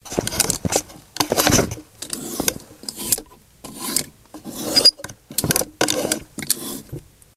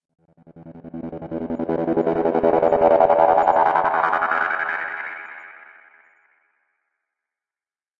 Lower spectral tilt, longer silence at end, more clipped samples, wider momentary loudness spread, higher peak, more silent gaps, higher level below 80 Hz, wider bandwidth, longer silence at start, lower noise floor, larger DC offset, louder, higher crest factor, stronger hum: second, -2 dB/octave vs -8 dB/octave; second, 0.35 s vs 2.45 s; neither; about the same, 20 LU vs 19 LU; about the same, 0 dBFS vs -2 dBFS; neither; first, -44 dBFS vs -56 dBFS; first, 16 kHz vs 7.2 kHz; second, 0.05 s vs 0.55 s; second, -42 dBFS vs under -90 dBFS; neither; about the same, -20 LUFS vs -19 LUFS; about the same, 24 dB vs 20 dB; neither